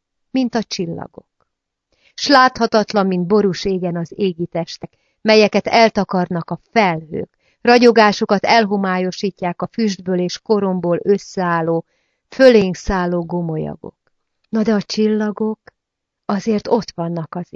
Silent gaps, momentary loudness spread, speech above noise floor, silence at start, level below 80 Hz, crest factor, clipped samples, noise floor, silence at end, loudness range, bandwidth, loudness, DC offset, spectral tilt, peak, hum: none; 13 LU; 62 dB; 0.35 s; -46 dBFS; 18 dB; under 0.1%; -79 dBFS; 0.1 s; 5 LU; 7.6 kHz; -17 LUFS; under 0.1%; -5.5 dB/octave; 0 dBFS; none